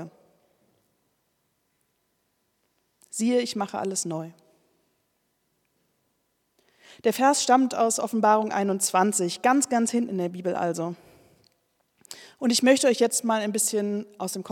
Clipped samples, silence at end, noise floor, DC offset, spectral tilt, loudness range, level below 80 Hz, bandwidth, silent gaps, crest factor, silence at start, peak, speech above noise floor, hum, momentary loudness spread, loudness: under 0.1%; 0 s; -73 dBFS; under 0.1%; -3.5 dB/octave; 11 LU; -82 dBFS; 18 kHz; none; 22 dB; 0 s; -6 dBFS; 50 dB; none; 14 LU; -24 LUFS